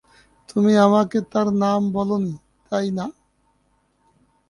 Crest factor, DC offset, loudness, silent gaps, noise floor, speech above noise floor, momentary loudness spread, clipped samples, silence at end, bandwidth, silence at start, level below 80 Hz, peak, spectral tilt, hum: 18 dB; under 0.1%; -20 LUFS; none; -65 dBFS; 46 dB; 14 LU; under 0.1%; 1.4 s; 11 kHz; 0.55 s; -60 dBFS; -2 dBFS; -7 dB/octave; none